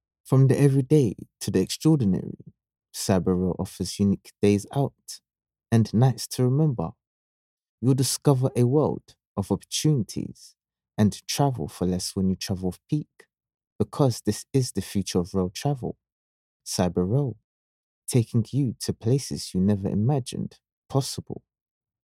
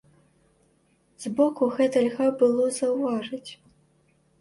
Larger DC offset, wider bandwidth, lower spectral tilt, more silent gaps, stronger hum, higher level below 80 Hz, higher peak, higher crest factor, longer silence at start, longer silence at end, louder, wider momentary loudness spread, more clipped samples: neither; first, 15.5 kHz vs 11.5 kHz; first, -6.5 dB/octave vs -5 dB/octave; first, 7.07-7.57 s, 7.69-7.78 s, 9.27-9.35 s, 13.54-13.58 s, 13.67-13.79 s, 16.12-16.60 s, 17.44-18.02 s, 20.72-20.82 s vs none; neither; first, -56 dBFS vs -70 dBFS; first, -4 dBFS vs -10 dBFS; about the same, 20 dB vs 16 dB; second, 0.25 s vs 1.2 s; second, 0.7 s vs 0.85 s; about the same, -25 LUFS vs -24 LUFS; about the same, 14 LU vs 15 LU; neither